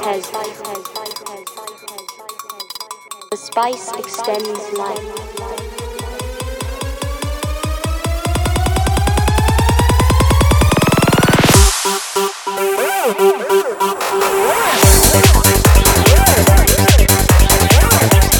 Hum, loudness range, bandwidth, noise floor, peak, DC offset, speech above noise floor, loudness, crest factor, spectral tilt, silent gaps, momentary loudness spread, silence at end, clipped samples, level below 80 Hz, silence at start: none; 14 LU; 19 kHz; -33 dBFS; 0 dBFS; under 0.1%; 11 dB; -13 LUFS; 14 dB; -4 dB/octave; none; 18 LU; 0 s; under 0.1%; -18 dBFS; 0 s